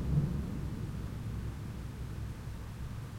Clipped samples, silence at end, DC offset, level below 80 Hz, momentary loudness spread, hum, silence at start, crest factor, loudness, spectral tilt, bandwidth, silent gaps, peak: under 0.1%; 0 s; under 0.1%; -44 dBFS; 9 LU; none; 0 s; 18 dB; -40 LUFS; -7.5 dB/octave; 16.5 kHz; none; -18 dBFS